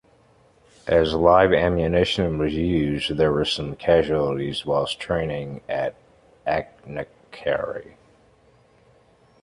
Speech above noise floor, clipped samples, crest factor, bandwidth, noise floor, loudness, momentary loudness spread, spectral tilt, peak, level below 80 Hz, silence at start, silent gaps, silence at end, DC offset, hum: 35 dB; under 0.1%; 20 dB; 11.5 kHz; -57 dBFS; -22 LUFS; 15 LU; -6 dB/octave; -4 dBFS; -42 dBFS; 0.85 s; none; 1.6 s; under 0.1%; none